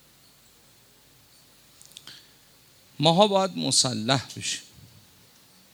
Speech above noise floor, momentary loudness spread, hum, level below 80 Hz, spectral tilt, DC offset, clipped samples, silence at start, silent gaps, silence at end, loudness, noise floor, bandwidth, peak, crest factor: 33 dB; 25 LU; none; -70 dBFS; -3.5 dB/octave; under 0.1%; under 0.1%; 2.05 s; none; 1.1 s; -23 LUFS; -57 dBFS; over 20 kHz; -4 dBFS; 26 dB